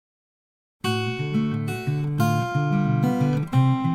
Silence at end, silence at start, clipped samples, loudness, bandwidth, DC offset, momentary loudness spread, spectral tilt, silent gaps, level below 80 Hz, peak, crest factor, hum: 0 s; 0.85 s; under 0.1%; -23 LUFS; 15.5 kHz; under 0.1%; 6 LU; -7 dB/octave; none; -56 dBFS; -8 dBFS; 16 dB; none